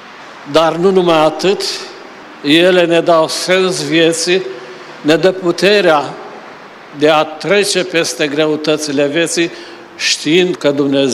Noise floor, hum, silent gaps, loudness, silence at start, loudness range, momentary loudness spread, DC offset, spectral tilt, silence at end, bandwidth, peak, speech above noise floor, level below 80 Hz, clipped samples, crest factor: -34 dBFS; none; none; -12 LUFS; 0 s; 2 LU; 20 LU; under 0.1%; -3.5 dB/octave; 0 s; 15.5 kHz; 0 dBFS; 22 dB; -58 dBFS; under 0.1%; 12 dB